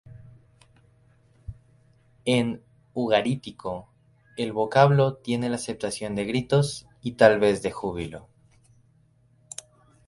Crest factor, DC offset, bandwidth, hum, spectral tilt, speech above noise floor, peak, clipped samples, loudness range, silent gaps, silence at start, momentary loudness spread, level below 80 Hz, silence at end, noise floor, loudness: 24 dB; under 0.1%; 11.5 kHz; none; -6 dB/octave; 38 dB; -4 dBFS; under 0.1%; 6 LU; none; 0.1 s; 22 LU; -56 dBFS; 1.9 s; -61 dBFS; -24 LUFS